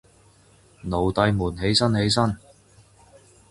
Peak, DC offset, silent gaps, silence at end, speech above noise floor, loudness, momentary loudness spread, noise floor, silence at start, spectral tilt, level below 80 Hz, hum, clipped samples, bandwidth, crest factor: -4 dBFS; under 0.1%; none; 1.15 s; 34 dB; -22 LUFS; 11 LU; -55 dBFS; 0.85 s; -5 dB/octave; -44 dBFS; none; under 0.1%; 11.5 kHz; 22 dB